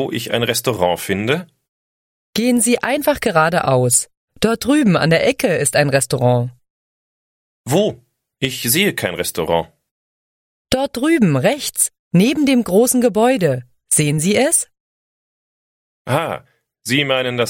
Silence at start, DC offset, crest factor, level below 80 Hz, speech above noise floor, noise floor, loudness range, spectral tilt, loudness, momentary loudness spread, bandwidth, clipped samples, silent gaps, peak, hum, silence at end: 0 s; under 0.1%; 18 dB; -50 dBFS; over 74 dB; under -90 dBFS; 5 LU; -4 dB/octave; -16 LUFS; 8 LU; 16.5 kHz; under 0.1%; 1.68-2.33 s, 4.17-4.28 s, 6.70-7.64 s, 9.91-10.65 s, 11.99-12.11 s, 14.80-16.05 s; 0 dBFS; none; 0 s